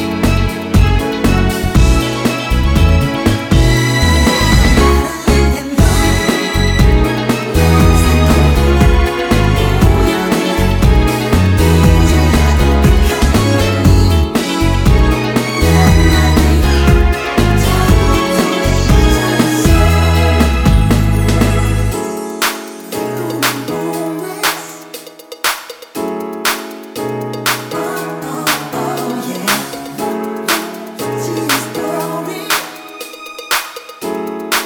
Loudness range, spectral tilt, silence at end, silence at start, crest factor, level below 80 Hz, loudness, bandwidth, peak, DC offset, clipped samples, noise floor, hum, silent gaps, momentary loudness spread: 7 LU; -5.5 dB/octave; 0 s; 0 s; 12 dB; -16 dBFS; -13 LUFS; 19 kHz; 0 dBFS; under 0.1%; under 0.1%; -32 dBFS; none; none; 11 LU